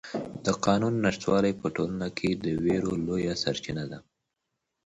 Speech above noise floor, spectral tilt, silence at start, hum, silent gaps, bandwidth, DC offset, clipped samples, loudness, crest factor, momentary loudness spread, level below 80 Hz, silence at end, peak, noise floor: 55 dB; -5.5 dB/octave; 0.05 s; none; none; 8.8 kHz; under 0.1%; under 0.1%; -28 LUFS; 20 dB; 10 LU; -54 dBFS; 0.85 s; -8 dBFS; -83 dBFS